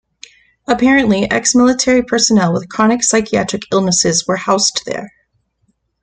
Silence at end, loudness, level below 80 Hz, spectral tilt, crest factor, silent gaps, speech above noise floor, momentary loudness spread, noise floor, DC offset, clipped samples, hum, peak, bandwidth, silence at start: 0.95 s; -13 LUFS; -46 dBFS; -3.5 dB/octave; 14 dB; none; 50 dB; 7 LU; -63 dBFS; under 0.1%; under 0.1%; none; 0 dBFS; 9.6 kHz; 0.7 s